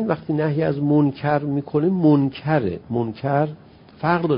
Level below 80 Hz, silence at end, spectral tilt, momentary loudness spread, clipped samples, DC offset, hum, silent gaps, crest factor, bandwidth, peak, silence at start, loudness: -52 dBFS; 0 s; -13 dB/octave; 8 LU; under 0.1%; under 0.1%; none; none; 16 dB; 5.4 kHz; -4 dBFS; 0 s; -21 LUFS